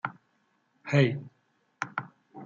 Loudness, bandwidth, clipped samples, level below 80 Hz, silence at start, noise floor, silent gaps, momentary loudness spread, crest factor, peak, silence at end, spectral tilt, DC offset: -30 LUFS; 7.4 kHz; under 0.1%; -72 dBFS; 0.05 s; -72 dBFS; none; 19 LU; 24 dB; -8 dBFS; 0 s; -7 dB/octave; under 0.1%